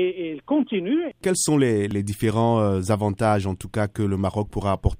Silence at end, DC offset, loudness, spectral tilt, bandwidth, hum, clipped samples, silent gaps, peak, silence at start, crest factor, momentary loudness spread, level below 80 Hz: 0.05 s; under 0.1%; -23 LUFS; -6 dB/octave; 16 kHz; none; under 0.1%; none; -6 dBFS; 0 s; 16 dB; 6 LU; -40 dBFS